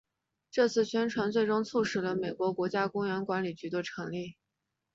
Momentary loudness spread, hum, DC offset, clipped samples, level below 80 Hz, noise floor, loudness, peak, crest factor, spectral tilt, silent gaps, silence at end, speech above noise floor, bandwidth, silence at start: 9 LU; none; under 0.1%; under 0.1%; -72 dBFS; -85 dBFS; -31 LUFS; -14 dBFS; 18 dB; -5.5 dB/octave; none; 0.6 s; 54 dB; 7.8 kHz; 0.55 s